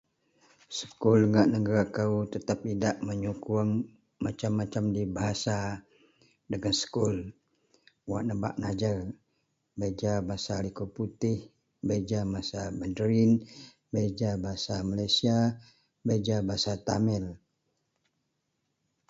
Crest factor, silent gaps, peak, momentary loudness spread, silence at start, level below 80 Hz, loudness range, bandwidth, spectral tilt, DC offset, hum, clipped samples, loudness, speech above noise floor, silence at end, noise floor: 20 dB; none; -10 dBFS; 12 LU; 0.7 s; -54 dBFS; 6 LU; 8 kHz; -6 dB/octave; under 0.1%; none; under 0.1%; -30 LUFS; 51 dB; 1.75 s; -79 dBFS